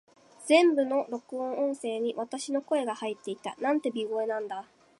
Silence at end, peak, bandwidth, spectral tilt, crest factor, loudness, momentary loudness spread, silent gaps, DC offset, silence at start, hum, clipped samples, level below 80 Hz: 0.4 s; -8 dBFS; 11.5 kHz; -3.5 dB/octave; 20 dB; -29 LUFS; 14 LU; none; under 0.1%; 0.4 s; none; under 0.1%; -84 dBFS